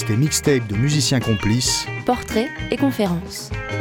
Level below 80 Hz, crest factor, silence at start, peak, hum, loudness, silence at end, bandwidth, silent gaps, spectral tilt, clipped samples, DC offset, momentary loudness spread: -38 dBFS; 16 dB; 0 s; -4 dBFS; none; -20 LUFS; 0 s; 18.5 kHz; none; -4.5 dB/octave; under 0.1%; under 0.1%; 8 LU